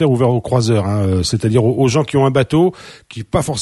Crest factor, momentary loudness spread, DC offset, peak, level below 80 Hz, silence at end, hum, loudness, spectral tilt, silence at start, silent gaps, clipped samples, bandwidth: 14 dB; 6 LU; under 0.1%; 0 dBFS; -40 dBFS; 0 s; none; -15 LUFS; -6.5 dB/octave; 0 s; none; under 0.1%; 12 kHz